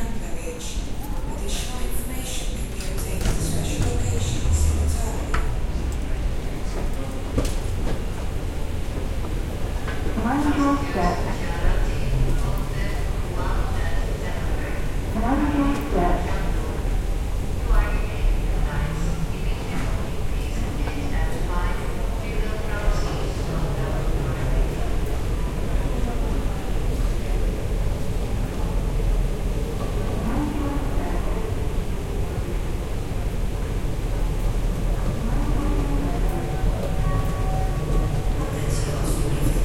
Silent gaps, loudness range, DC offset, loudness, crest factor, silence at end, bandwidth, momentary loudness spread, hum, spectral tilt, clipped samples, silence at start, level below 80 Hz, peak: none; 3 LU; under 0.1%; -27 LUFS; 14 dB; 0 s; 15.5 kHz; 6 LU; none; -6 dB/octave; under 0.1%; 0 s; -24 dBFS; -8 dBFS